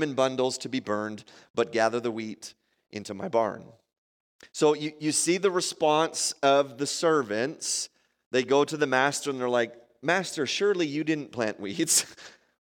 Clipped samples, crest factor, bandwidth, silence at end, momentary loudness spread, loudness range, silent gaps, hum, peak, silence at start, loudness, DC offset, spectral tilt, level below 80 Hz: under 0.1%; 20 dB; 17 kHz; 0.3 s; 13 LU; 5 LU; 1.50-1.54 s, 3.98-4.39 s, 8.26-8.31 s; none; -8 dBFS; 0 s; -27 LUFS; under 0.1%; -3 dB/octave; -78 dBFS